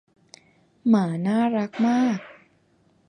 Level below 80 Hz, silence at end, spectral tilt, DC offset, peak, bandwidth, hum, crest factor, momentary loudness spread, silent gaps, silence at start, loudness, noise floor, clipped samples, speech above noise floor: -74 dBFS; 0.75 s; -7.5 dB/octave; under 0.1%; -8 dBFS; 9.6 kHz; none; 16 dB; 6 LU; none; 0.85 s; -23 LUFS; -62 dBFS; under 0.1%; 41 dB